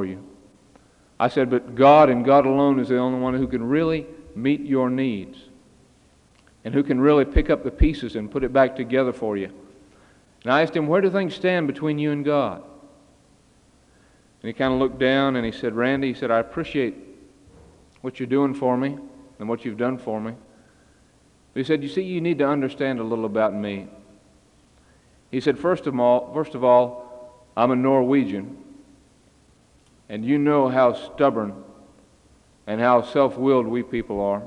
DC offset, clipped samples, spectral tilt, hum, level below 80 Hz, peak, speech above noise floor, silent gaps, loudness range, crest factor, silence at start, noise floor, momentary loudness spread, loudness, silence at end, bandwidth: under 0.1%; under 0.1%; -8 dB/octave; none; -40 dBFS; -2 dBFS; 36 dB; none; 8 LU; 20 dB; 0 s; -57 dBFS; 15 LU; -21 LUFS; 0 s; 9.8 kHz